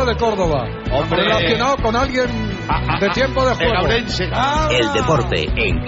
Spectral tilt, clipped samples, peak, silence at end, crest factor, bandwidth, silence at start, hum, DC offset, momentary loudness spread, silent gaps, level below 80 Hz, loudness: -3.5 dB/octave; under 0.1%; -4 dBFS; 0 s; 14 dB; 8 kHz; 0 s; none; under 0.1%; 5 LU; none; -28 dBFS; -17 LUFS